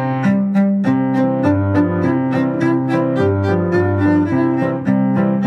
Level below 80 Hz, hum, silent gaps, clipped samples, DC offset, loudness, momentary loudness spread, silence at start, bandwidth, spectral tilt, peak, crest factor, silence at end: -58 dBFS; none; none; under 0.1%; under 0.1%; -16 LUFS; 2 LU; 0 s; 7.8 kHz; -9.5 dB/octave; -2 dBFS; 12 dB; 0 s